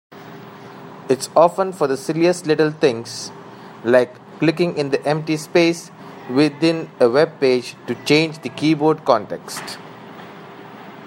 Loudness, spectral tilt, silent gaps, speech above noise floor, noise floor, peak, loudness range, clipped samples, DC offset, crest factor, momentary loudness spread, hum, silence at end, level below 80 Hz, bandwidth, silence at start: -19 LUFS; -5.5 dB/octave; none; 20 dB; -38 dBFS; 0 dBFS; 2 LU; under 0.1%; under 0.1%; 18 dB; 21 LU; none; 0 s; -66 dBFS; 16 kHz; 0.1 s